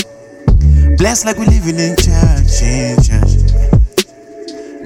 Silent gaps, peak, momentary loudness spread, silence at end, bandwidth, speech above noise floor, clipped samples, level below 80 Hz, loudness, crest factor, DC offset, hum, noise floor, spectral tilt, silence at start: none; 0 dBFS; 15 LU; 0 s; 16.5 kHz; 21 dB; under 0.1%; -12 dBFS; -12 LUFS; 10 dB; under 0.1%; none; -31 dBFS; -5.5 dB/octave; 0 s